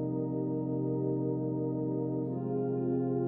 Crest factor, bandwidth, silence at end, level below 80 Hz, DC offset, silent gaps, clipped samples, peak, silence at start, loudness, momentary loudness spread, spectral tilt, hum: 10 dB; 2 kHz; 0 s; -68 dBFS; under 0.1%; none; under 0.1%; -20 dBFS; 0 s; -33 LUFS; 2 LU; -14 dB/octave; none